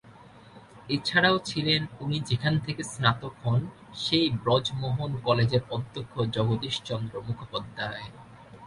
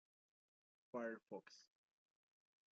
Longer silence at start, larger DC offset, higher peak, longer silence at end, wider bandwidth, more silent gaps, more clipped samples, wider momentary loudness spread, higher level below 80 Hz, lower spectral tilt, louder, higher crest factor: second, 0.05 s vs 0.95 s; neither; first, -6 dBFS vs -36 dBFS; second, 0 s vs 1.1 s; first, 11.5 kHz vs 7.4 kHz; neither; neither; second, 11 LU vs 16 LU; first, -56 dBFS vs under -90 dBFS; first, -5.5 dB/octave vs -3.5 dB/octave; first, -27 LUFS vs -52 LUFS; about the same, 22 dB vs 22 dB